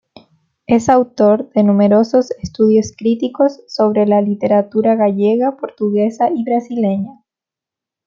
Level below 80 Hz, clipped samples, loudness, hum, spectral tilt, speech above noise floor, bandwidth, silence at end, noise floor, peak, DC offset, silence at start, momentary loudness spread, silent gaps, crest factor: -54 dBFS; under 0.1%; -15 LUFS; none; -7.5 dB/octave; 73 dB; 7.4 kHz; 0.95 s; -87 dBFS; -2 dBFS; under 0.1%; 0.7 s; 6 LU; none; 12 dB